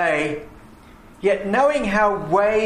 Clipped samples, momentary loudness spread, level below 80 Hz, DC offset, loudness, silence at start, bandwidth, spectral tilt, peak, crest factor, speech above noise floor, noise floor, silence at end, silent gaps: under 0.1%; 7 LU; -46 dBFS; under 0.1%; -20 LUFS; 0 s; 11.5 kHz; -5.5 dB/octave; -6 dBFS; 14 dB; 26 dB; -45 dBFS; 0 s; none